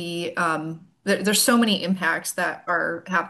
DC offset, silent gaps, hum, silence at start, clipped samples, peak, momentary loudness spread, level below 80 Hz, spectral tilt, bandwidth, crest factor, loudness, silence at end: under 0.1%; none; none; 0 s; under 0.1%; -6 dBFS; 10 LU; -70 dBFS; -3 dB/octave; 13 kHz; 18 dB; -22 LUFS; 0 s